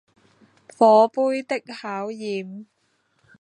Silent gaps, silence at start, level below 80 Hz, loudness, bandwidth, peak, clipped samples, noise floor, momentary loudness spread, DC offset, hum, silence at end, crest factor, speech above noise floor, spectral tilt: none; 0.8 s; -80 dBFS; -21 LUFS; 10 kHz; -2 dBFS; under 0.1%; -68 dBFS; 17 LU; under 0.1%; none; 0.8 s; 20 dB; 47 dB; -5.5 dB/octave